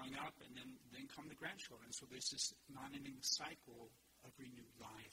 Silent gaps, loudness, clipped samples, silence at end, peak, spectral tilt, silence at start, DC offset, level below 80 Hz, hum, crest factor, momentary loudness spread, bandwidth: none; -48 LUFS; under 0.1%; 0 s; -28 dBFS; -1.5 dB/octave; 0 s; under 0.1%; -78 dBFS; none; 24 dB; 18 LU; 16 kHz